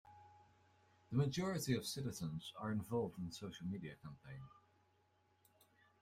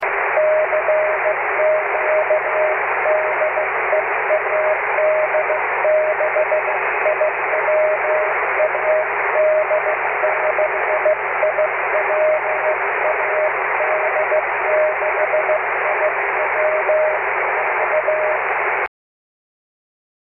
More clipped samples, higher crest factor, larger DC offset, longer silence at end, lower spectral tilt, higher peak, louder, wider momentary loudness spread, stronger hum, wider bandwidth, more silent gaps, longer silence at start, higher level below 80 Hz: neither; first, 20 dB vs 14 dB; neither; about the same, 1.45 s vs 1.5 s; second, -5.5 dB/octave vs -7 dB/octave; second, -24 dBFS vs -4 dBFS; second, -43 LUFS vs -17 LUFS; first, 17 LU vs 2 LU; neither; first, 16 kHz vs 3.2 kHz; neither; about the same, 0.05 s vs 0 s; second, -72 dBFS vs -56 dBFS